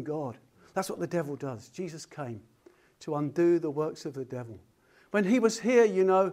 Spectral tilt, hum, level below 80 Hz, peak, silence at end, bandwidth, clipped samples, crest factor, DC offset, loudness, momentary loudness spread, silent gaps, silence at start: -6 dB/octave; none; -74 dBFS; -10 dBFS; 0 s; 15 kHz; under 0.1%; 18 dB; under 0.1%; -29 LUFS; 17 LU; none; 0 s